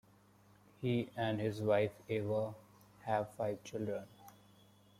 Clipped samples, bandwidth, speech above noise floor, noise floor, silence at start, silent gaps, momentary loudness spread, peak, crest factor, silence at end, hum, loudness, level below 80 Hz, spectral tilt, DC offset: under 0.1%; 15.5 kHz; 29 dB; -66 dBFS; 0.8 s; none; 11 LU; -20 dBFS; 18 dB; 0.7 s; none; -38 LUFS; -74 dBFS; -7 dB/octave; under 0.1%